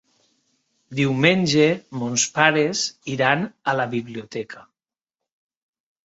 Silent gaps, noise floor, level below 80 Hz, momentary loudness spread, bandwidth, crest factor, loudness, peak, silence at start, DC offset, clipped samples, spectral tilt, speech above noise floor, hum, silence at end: none; under -90 dBFS; -62 dBFS; 15 LU; 8 kHz; 22 dB; -20 LUFS; -2 dBFS; 0.9 s; under 0.1%; under 0.1%; -4 dB/octave; over 69 dB; none; 1.5 s